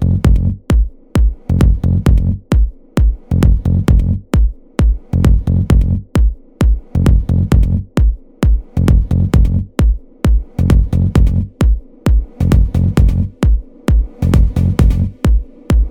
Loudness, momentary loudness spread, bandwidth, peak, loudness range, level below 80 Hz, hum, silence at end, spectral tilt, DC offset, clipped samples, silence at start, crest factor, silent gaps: -15 LUFS; 4 LU; 10.5 kHz; 0 dBFS; 1 LU; -14 dBFS; none; 0 s; -8 dB/octave; under 0.1%; under 0.1%; 0 s; 12 dB; none